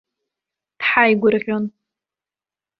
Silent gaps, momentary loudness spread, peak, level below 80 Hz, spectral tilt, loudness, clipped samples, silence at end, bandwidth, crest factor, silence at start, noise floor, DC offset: none; 11 LU; -2 dBFS; -64 dBFS; -8 dB/octave; -17 LUFS; under 0.1%; 1.1 s; 5.6 kHz; 20 dB; 0.8 s; under -90 dBFS; under 0.1%